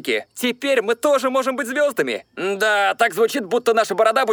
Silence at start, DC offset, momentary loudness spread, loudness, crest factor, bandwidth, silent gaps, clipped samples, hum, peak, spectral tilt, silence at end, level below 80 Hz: 0.05 s; under 0.1%; 7 LU; -19 LUFS; 16 dB; over 20 kHz; none; under 0.1%; none; -4 dBFS; -2.5 dB/octave; 0 s; -72 dBFS